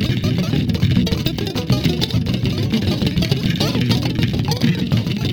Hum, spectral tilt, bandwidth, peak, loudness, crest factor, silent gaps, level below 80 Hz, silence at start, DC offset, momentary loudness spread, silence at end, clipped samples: none; -6 dB/octave; 19.5 kHz; -2 dBFS; -19 LUFS; 16 dB; none; -34 dBFS; 0 s; under 0.1%; 2 LU; 0 s; under 0.1%